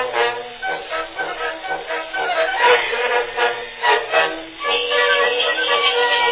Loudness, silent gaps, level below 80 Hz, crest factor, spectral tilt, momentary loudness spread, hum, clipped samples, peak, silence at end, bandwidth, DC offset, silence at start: -18 LUFS; none; -56 dBFS; 18 dB; -4.5 dB/octave; 11 LU; none; under 0.1%; -2 dBFS; 0 s; 4 kHz; under 0.1%; 0 s